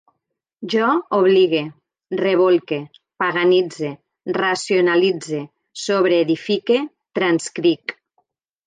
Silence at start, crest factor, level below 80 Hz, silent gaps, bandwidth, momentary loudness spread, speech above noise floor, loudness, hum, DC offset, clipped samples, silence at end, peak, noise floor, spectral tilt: 0.6 s; 14 dB; -72 dBFS; none; 9.4 kHz; 13 LU; 59 dB; -19 LUFS; none; under 0.1%; under 0.1%; 0.75 s; -6 dBFS; -77 dBFS; -5 dB/octave